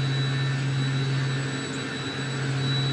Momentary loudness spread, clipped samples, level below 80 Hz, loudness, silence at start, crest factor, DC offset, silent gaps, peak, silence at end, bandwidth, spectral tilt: 5 LU; under 0.1%; -64 dBFS; -27 LUFS; 0 s; 12 dB; under 0.1%; none; -14 dBFS; 0 s; 10.5 kHz; -5.5 dB/octave